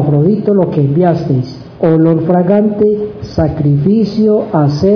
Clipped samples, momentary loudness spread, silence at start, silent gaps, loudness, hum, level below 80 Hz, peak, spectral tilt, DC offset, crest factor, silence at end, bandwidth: under 0.1%; 6 LU; 0 s; none; -12 LUFS; none; -38 dBFS; 0 dBFS; -10 dB/octave; under 0.1%; 10 dB; 0 s; 5.4 kHz